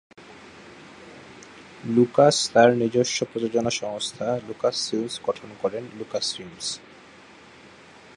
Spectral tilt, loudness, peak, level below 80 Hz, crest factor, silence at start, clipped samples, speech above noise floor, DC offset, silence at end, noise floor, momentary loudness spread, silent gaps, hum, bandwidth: -4 dB/octave; -23 LUFS; -2 dBFS; -64 dBFS; 22 dB; 0.2 s; under 0.1%; 25 dB; under 0.1%; 1.4 s; -49 dBFS; 27 LU; none; none; 11.5 kHz